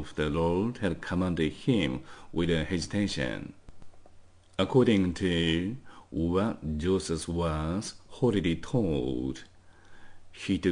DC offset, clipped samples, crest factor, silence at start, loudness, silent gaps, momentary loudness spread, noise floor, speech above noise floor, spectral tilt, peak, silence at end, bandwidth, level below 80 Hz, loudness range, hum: under 0.1%; under 0.1%; 18 dB; 0 s; -29 LUFS; none; 11 LU; -53 dBFS; 24 dB; -6 dB/octave; -12 dBFS; 0 s; 10.5 kHz; -48 dBFS; 3 LU; none